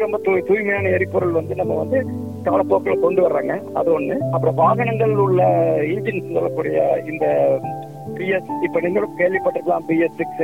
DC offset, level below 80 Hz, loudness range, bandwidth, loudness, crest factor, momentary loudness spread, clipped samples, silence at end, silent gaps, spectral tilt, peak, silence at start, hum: 0.3%; -60 dBFS; 3 LU; 16.5 kHz; -19 LUFS; 16 dB; 6 LU; under 0.1%; 0 s; none; -9 dB/octave; -4 dBFS; 0 s; none